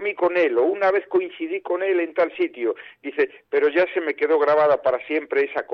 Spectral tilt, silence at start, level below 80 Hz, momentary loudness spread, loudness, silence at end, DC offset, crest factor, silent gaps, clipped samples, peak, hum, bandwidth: -6.5 dB/octave; 0 s; -68 dBFS; 9 LU; -21 LUFS; 0 s; under 0.1%; 12 dB; none; under 0.1%; -10 dBFS; none; 6 kHz